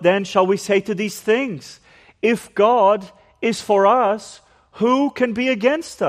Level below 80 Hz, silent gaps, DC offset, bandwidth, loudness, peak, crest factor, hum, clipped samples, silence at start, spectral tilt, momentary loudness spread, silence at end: -62 dBFS; none; under 0.1%; 15 kHz; -18 LUFS; -2 dBFS; 16 dB; none; under 0.1%; 0 s; -5 dB/octave; 9 LU; 0 s